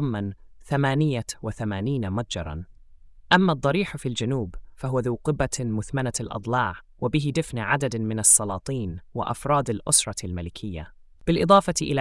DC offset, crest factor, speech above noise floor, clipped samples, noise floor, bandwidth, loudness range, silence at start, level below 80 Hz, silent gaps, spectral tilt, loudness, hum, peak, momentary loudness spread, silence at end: under 0.1%; 22 dB; 24 dB; under 0.1%; -48 dBFS; 12 kHz; 5 LU; 0 s; -46 dBFS; none; -4 dB/octave; -24 LUFS; none; -4 dBFS; 14 LU; 0 s